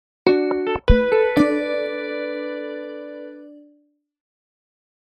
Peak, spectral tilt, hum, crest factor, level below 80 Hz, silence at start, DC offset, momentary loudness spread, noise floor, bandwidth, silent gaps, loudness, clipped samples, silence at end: -2 dBFS; -7.5 dB/octave; none; 22 dB; -30 dBFS; 0.25 s; under 0.1%; 18 LU; -61 dBFS; 13.5 kHz; none; -21 LUFS; under 0.1%; 1.55 s